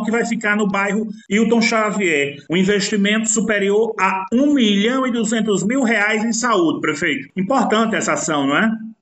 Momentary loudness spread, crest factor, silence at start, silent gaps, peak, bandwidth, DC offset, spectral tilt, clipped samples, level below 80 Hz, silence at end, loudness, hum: 5 LU; 14 dB; 0 s; none; -4 dBFS; 9 kHz; under 0.1%; -4 dB/octave; under 0.1%; -60 dBFS; 0.1 s; -17 LUFS; none